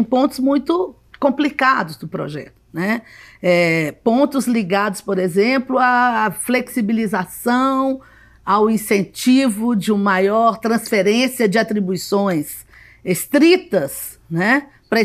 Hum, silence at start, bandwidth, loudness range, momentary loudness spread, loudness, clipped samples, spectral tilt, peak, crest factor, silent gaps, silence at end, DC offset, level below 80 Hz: none; 0 s; 15.5 kHz; 3 LU; 11 LU; -17 LUFS; under 0.1%; -5 dB/octave; -2 dBFS; 16 dB; none; 0 s; under 0.1%; -56 dBFS